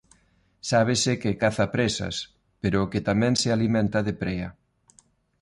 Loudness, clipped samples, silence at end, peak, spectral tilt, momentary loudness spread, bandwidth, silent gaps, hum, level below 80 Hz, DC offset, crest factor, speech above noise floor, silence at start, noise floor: -25 LUFS; under 0.1%; 0.9 s; -8 dBFS; -5 dB/octave; 11 LU; 11.5 kHz; none; none; -48 dBFS; under 0.1%; 16 dB; 40 dB; 0.65 s; -64 dBFS